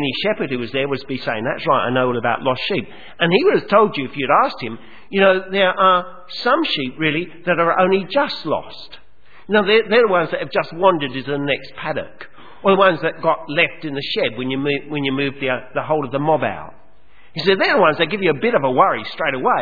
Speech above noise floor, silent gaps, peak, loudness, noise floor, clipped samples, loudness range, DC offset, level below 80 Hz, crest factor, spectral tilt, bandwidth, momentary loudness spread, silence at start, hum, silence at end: 35 dB; none; 0 dBFS; -18 LUFS; -53 dBFS; under 0.1%; 3 LU; 1%; -56 dBFS; 18 dB; -7.5 dB/octave; 5 kHz; 10 LU; 0 s; none; 0 s